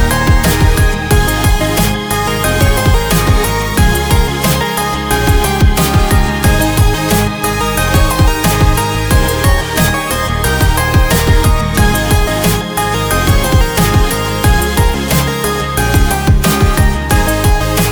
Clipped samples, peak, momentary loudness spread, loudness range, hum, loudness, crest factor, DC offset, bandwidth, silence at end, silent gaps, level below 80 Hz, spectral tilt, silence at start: under 0.1%; 0 dBFS; 3 LU; 1 LU; none; -12 LUFS; 10 dB; 0.2%; over 20 kHz; 0 s; none; -16 dBFS; -4.5 dB/octave; 0 s